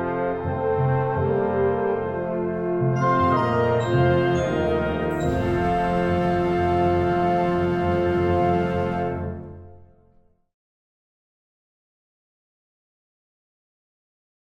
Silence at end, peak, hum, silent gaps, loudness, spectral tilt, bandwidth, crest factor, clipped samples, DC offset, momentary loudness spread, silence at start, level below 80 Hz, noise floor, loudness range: 4.6 s; -8 dBFS; none; none; -22 LUFS; -8 dB/octave; 8.4 kHz; 16 dB; under 0.1%; under 0.1%; 6 LU; 0 s; -44 dBFS; -58 dBFS; 6 LU